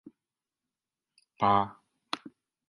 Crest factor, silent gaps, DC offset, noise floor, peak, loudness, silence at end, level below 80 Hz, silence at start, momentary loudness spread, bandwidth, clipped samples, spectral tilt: 24 dB; none; under 0.1%; under -90 dBFS; -10 dBFS; -30 LUFS; 0.4 s; -66 dBFS; 1.4 s; 14 LU; 11.5 kHz; under 0.1%; -6 dB/octave